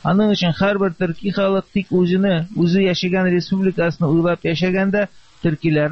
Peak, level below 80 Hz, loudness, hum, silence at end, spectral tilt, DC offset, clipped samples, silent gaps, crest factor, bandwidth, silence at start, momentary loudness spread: -4 dBFS; -48 dBFS; -18 LUFS; none; 0 s; -7.5 dB/octave; 0.5%; under 0.1%; none; 14 dB; 6.4 kHz; 0.05 s; 5 LU